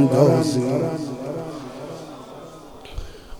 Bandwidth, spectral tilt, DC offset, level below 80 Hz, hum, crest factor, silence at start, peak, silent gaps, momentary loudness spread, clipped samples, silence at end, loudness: 19 kHz; -7 dB/octave; under 0.1%; -42 dBFS; none; 20 dB; 0 s; -2 dBFS; none; 23 LU; under 0.1%; 0 s; -21 LUFS